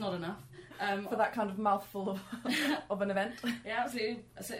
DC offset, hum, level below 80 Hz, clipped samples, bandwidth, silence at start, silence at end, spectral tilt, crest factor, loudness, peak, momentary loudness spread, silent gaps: under 0.1%; none; -68 dBFS; under 0.1%; 16 kHz; 0 s; 0 s; -4.5 dB/octave; 18 dB; -35 LUFS; -16 dBFS; 8 LU; none